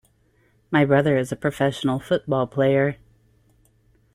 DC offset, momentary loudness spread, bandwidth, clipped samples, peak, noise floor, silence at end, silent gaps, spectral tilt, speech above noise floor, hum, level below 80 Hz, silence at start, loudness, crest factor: under 0.1%; 8 LU; 15 kHz; under 0.1%; -6 dBFS; -62 dBFS; 1.2 s; none; -7 dB/octave; 41 dB; none; -56 dBFS; 0.7 s; -22 LUFS; 18 dB